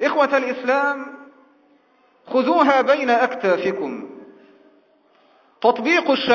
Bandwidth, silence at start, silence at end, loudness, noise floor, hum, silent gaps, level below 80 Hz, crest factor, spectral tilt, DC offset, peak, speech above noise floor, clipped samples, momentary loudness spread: 7 kHz; 0 s; 0 s; -19 LUFS; -58 dBFS; none; none; -70 dBFS; 20 dB; -4.5 dB/octave; under 0.1%; 0 dBFS; 40 dB; under 0.1%; 14 LU